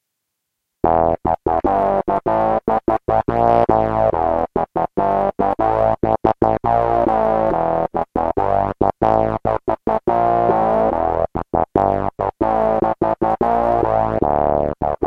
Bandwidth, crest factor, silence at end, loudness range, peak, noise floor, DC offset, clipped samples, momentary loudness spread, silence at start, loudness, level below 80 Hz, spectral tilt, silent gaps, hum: 6 kHz; 16 dB; 0 s; 1 LU; -2 dBFS; -77 dBFS; under 0.1%; under 0.1%; 5 LU; 0.85 s; -18 LUFS; -36 dBFS; -9.5 dB/octave; none; none